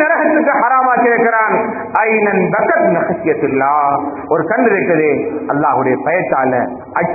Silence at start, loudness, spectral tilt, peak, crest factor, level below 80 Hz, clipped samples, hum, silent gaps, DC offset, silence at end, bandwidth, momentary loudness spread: 0 s; -13 LUFS; -13 dB/octave; 0 dBFS; 14 dB; -54 dBFS; under 0.1%; none; none; under 0.1%; 0 s; 2.7 kHz; 6 LU